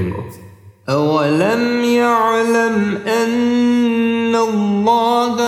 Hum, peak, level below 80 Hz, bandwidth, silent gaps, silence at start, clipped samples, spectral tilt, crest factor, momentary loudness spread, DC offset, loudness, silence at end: none; -2 dBFS; -54 dBFS; 13.5 kHz; none; 0 s; under 0.1%; -5.5 dB/octave; 14 dB; 5 LU; under 0.1%; -15 LUFS; 0 s